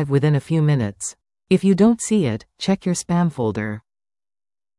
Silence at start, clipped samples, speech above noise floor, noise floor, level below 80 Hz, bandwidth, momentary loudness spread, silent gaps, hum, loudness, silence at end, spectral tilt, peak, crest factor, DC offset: 0 s; under 0.1%; over 71 dB; under -90 dBFS; -54 dBFS; 12 kHz; 12 LU; none; none; -20 LUFS; 1 s; -6.5 dB/octave; -4 dBFS; 16 dB; under 0.1%